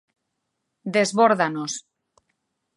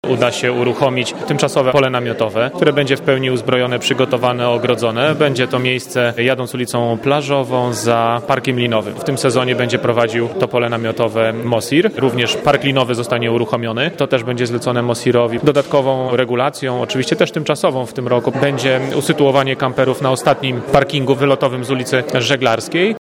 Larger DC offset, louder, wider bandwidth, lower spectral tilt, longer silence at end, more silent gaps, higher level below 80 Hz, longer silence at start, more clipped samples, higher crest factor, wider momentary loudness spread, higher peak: neither; second, -21 LUFS vs -16 LUFS; second, 11.5 kHz vs 17 kHz; about the same, -4 dB/octave vs -5 dB/octave; first, 0.95 s vs 0.05 s; neither; second, -78 dBFS vs -52 dBFS; first, 0.85 s vs 0.05 s; neither; about the same, 20 dB vs 16 dB; first, 15 LU vs 4 LU; second, -4 dBFS vs 0 dBFS